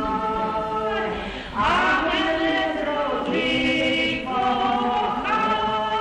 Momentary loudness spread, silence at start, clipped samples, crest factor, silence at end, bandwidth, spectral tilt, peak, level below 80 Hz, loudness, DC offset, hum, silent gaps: 5 LU; 0 s; under 0.1%; 12 dB; 0 s; 10.5 kHz; -4.5 dB/octave; -10 dBFS; -44 dBFS; -22 LUFS; under 0.1%; none; none